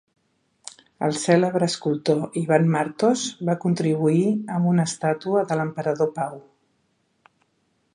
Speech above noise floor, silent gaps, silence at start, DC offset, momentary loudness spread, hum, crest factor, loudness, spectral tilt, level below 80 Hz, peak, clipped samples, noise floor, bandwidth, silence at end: 47 dB; none; 1 s; under 0.1%; 8 LU; none; 20 dB; -22 LUFS; -6 dB/octave; -70 dBFS; -4 dBFS; under 0.1%; -69 dBFS; 11 kHz; 1.55 s